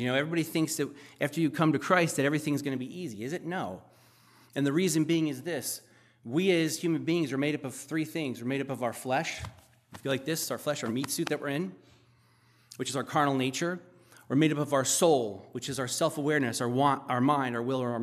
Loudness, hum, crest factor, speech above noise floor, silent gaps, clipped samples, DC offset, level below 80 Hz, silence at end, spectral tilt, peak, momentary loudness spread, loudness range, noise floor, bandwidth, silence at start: -30 LUFS; none; 20 dB; 34 dB; none; under 0.1%; under 0.1%; -68 dBFS; 0 s; -4.5 dB/octave; -10 dBFS; 11 LU; 5 LU; -64 dBFS; 15 kHz; 0 s